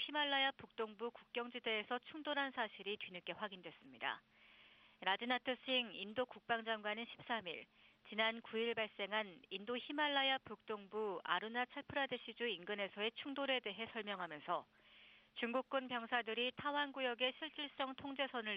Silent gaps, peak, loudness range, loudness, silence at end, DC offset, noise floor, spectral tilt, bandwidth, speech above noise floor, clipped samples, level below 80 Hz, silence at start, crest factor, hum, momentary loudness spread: none; -20 dBFS; 3 LU; -42 LUFS; 0 s; under 0.1%; -67 dBFS; -5.5 dB/octave; 5.8 kHz; 24 dB; under 0.1%; -84 dBFS; 0 s; 22 dB; none; 9 LU